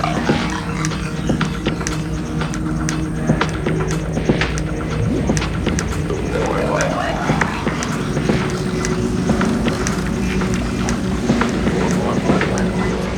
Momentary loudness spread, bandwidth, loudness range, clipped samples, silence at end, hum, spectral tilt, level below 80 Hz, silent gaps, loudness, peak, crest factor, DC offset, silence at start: 4 LU; 18 kHz; 2 LU; under 0.1%; 0 s; none; -5.5 dB/octave; -30 dBFS; none; -19 LUFS; 0 dBFS; 18 dB; under 0.1%; 0 s